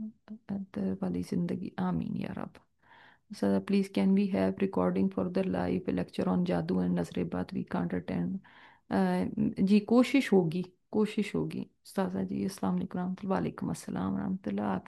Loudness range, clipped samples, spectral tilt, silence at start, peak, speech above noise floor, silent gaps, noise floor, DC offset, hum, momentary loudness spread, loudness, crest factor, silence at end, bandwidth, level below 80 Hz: 5 LU; under 0.1%; -7.5 dB/octave; 0 s; -12 dBFS; 29 dB; none; -60 dBFS; under 0.1%; none; 10 LU; -31 LUFS; 18 dB; 0.05 s; 12.5 kHz; -66 dBFS